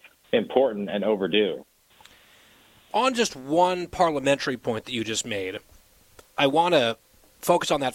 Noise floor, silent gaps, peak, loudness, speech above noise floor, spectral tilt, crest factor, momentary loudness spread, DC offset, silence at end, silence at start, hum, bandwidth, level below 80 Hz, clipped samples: -56 dBFS; none; -6 dBFS; -24 LUFS; 32 dB; -4 dB/octave; 20 dB; 10 LU; under 0.1%; 0 s; 0.3 s; none; 16.5 kHz; -60 dBFS; under 0.1%